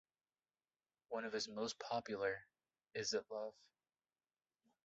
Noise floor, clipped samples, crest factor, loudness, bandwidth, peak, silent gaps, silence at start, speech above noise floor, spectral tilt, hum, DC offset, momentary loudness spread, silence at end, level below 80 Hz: under -90 dBFS; under 0.1%; 20 dB; -45 LUFS; 7.6 kHz; -28 dBFS; none; 1.1 s; over 46 dB; -1.5 dB/octave; none; under 0.1%; 8 LU; 1.35 s; -84 dBFS